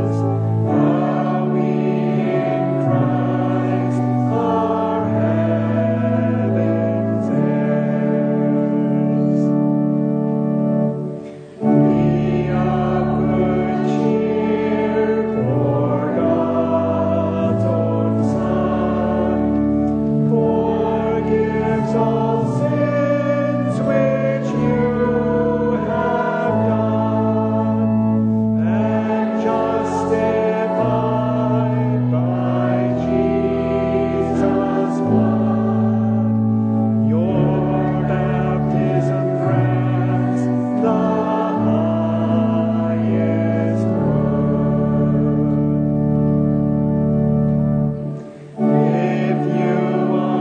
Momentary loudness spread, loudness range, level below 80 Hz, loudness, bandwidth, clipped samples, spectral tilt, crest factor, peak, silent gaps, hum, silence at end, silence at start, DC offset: 2 LU; 1 LU; -42 dBFS; -18 LUFS; 7.8 kHz; under 0.1%; -9.5 dB/octave; 14 dB; -4 dBFS; none; none; 0 s; 0 s; under 0.1%